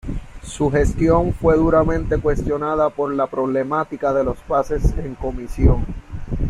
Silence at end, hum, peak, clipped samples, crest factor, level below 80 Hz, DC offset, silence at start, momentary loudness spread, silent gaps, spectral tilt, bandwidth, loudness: 0 s; none; -2 dBFS; under 0.1%; 16 dB; -26 dBFS; under 0.1%; 0.05 s; 12 LU; none; -8 dB/octave; 12 kHz; -19 LUFS